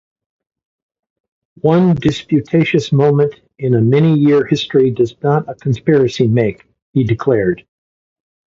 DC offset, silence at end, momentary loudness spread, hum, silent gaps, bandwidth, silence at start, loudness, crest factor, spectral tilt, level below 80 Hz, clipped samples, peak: under 0.1%; 0.85 s; 7 LU; none; 6.82-6.93 s; 7.6 kHz; 1.65 s; -14 LUFS; 14 dB; -8 dB/octave; -48 dBFS; under 0.1%; 0 dBFS